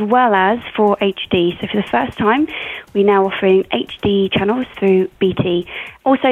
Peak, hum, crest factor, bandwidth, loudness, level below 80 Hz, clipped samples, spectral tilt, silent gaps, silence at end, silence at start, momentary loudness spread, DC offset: -2 dBFS; none; 14 dB; 4.1 kHz; -16 LUFS; -48 dBFS; under 0.1%; -7.5 dB/octave; none; 0 s; 0 s; 7 LU; under 0.1%